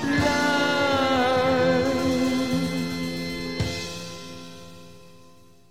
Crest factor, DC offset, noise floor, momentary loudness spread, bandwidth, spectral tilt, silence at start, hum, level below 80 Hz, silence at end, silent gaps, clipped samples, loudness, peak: 16 dB; 0.5%; -53 dBFS; 16 LU; 16 kHz; -5 dB/octave; 0 s; none; -48 dBFS; 0.7 s; none; under 0.1%; -23 LUFS; -10 dBFS